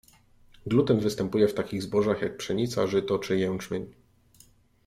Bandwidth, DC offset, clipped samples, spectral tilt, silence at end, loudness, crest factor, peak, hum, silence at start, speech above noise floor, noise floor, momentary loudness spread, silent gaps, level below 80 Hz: 15.5 kHz; under 0.1%; under 0.1%; -6.5 dB/octave; 0.95 s; -27 LUFS; 18 dB; -10 dBFS; none; 0.65 s; 33 dB; -59 dBFS; 9 LU; none; -58 dBFS